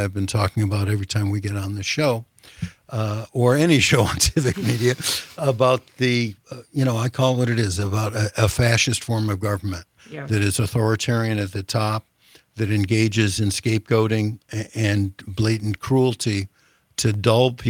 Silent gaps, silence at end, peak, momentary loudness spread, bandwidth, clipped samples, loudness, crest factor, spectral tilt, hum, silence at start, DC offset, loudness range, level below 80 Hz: none; 0 s; 0 dBFS; 10 LU; 17.5 kHz; under 0.1%; -21 LUFS; 20 dB; -5 dB/octave; none; 0 s; under 0.1%; 4 LU; -46 dBFS